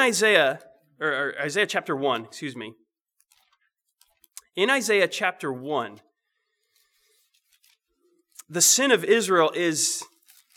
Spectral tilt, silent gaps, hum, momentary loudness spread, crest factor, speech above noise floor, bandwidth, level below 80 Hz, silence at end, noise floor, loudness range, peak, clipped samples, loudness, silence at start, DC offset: -1.5 dB/octave; none; none; 17 LU; 22 dB; 55 dB; 19.5 kHz; -88 dBFS; 0.55 s; -78 dBFS; 8 LU; -4 dBFS; under 0.1%; -22 LUFS; 0 s; under 0.1%